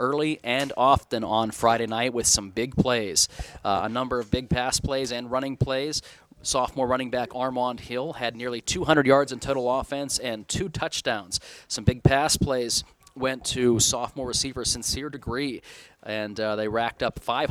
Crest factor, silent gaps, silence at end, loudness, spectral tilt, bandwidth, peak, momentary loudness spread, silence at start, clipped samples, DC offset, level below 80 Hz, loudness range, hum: 22 dB; none; 0 s; -25 LUFS; -3.5 dB/octave; 17.5 kHz; -4 dBFS; 9 LU; 0 s; under 0.1%; under 0.1%; -44 dBFS; 4 LU; none